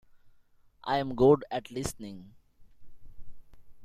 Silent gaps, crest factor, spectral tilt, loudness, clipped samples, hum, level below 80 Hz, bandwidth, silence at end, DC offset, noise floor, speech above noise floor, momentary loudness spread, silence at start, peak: none; 22 dB; -6 dB/octave; -28 LUFS; under 0.1%; none; -54 dBFS; 15.5 kHz; 0 s; under 0.1%; -60 dBFS; 32 dB; 21 LU; 0.15 s; -10 dBFS